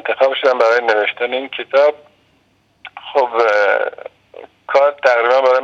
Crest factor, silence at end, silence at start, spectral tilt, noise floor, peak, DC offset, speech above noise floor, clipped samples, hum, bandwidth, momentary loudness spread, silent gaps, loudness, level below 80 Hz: 16 dB; 0 s; 0.05 s; -2 dB/octave; -58 dBFS; 0 dBFS; under 0.1%; 44 dB; under 0.1%; none; 7.4 kHz; 18 LU; none; -15 LUFS; -70 dBFS